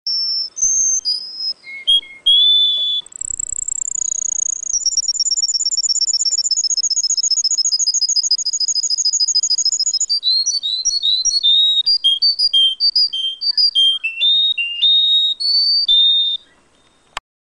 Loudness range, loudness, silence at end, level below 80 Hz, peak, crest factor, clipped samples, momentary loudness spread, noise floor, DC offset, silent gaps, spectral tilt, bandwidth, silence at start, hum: 3 LU; -13 LUFS; 0.35 s; -54 dBFS; -2 dBFS; 14 dB; under 0.1%; 9 LU; -55 dBFS; under 0.1%; none; 5.5 dB/octave; 10.5 kHz; 0.05 s; none